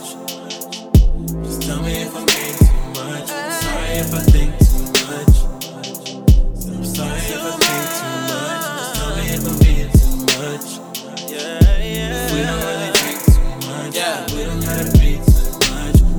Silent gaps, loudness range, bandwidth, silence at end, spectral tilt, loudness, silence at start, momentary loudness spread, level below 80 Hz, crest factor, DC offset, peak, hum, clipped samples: none; 2 LU; over 20 kHz; 0 s; -4.5 dB/octave; -18 LUFS; 0 s; 12 LU; -18 dBFS; 16 dB; under 0.1%; 0 dBFS; none; under 0.1%